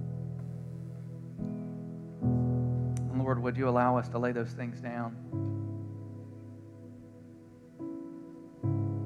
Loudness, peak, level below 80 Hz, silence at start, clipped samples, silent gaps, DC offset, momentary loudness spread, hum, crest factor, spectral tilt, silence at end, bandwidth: -34 LUFS; -14 dBFS; -58 dBFS; 0 s; under 0.1%; none; under 0.1%; 20 LU; none; 20 dB; -9 dB/octave; 0 s; 9.6 kHz